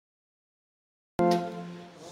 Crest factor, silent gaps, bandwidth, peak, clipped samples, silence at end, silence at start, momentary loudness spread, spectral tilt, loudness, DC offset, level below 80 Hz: 20 dB; none; 16 kHz; -12 dBFS; under 0.1%; 0 s; 1.2 s; 17 LU; -6.5 dB/octave; -29 LUFS; under 0.1%; -64 dBFS